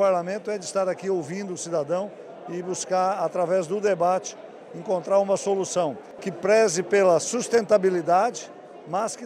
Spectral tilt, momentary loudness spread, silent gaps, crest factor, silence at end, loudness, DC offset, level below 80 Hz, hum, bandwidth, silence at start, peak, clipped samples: -4 dB/octave; 15 LU; none; 18 dB; 0 s; -24 LUFS; under 0.1%; -72 dBFS; none; 13 kHz; 0 s; -6 dBFS; under 0.1%